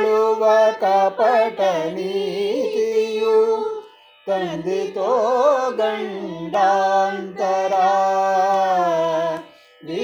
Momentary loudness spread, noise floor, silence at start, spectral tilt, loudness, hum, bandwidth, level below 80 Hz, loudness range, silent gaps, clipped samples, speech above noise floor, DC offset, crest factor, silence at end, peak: 9 LU; -41 dBFS; 0 s; -4.5 dB/octave; -19 LUFS; none; 19.5 kHz; -68 dBFS; 3 LU; none; under 0.1%; 22 dB; under 0.1%; 12 dB; 0 s; -6 dBFS